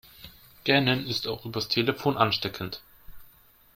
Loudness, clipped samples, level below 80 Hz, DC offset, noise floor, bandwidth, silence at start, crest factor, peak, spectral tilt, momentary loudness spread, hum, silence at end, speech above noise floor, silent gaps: -26 LUFS; under 0.1%; -58 dBFS; under 0.1%; -57 dBFS; 16.5 kHz; 0.2 s; 24 dB; -6 dBFS; -5 dB/octave; 21 LU; none; 0.5 s; 30 dB; none